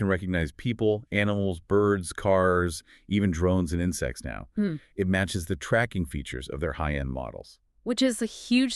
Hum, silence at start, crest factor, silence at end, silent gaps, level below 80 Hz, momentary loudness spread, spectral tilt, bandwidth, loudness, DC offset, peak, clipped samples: none; 0 s; 18 dB; 0 s; none; -42 dBFS; 10 LU; -5.5 dB/octave; 13.5 kHz; -27 LUFS; under 0.1%; -8 dBFS; under 0.1%